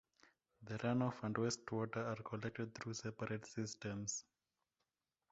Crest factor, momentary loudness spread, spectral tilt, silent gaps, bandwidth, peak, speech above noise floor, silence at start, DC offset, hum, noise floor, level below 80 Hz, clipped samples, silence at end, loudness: 20 dB; 7 LU; -5.5 dB/octave; none; 8 kHz; -24 dBFS; over 47 dB; 0.6 s; under 0.1%; none; under -90 dBFS; -74 dBFS; under 0.1%; 1.1 s; -44 LUFS